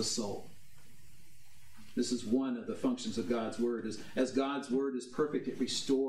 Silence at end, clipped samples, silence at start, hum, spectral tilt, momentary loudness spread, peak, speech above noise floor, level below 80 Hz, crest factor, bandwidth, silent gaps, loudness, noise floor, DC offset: 0 s; under 0.1%; 0 s; none; -4 dB/octave; 6 LU; -18 dBFS; 28 dB; -70 dBFS; 16 dB; 14.5 kHz; none; -35 LUFS; -62 dBFS; 0.5%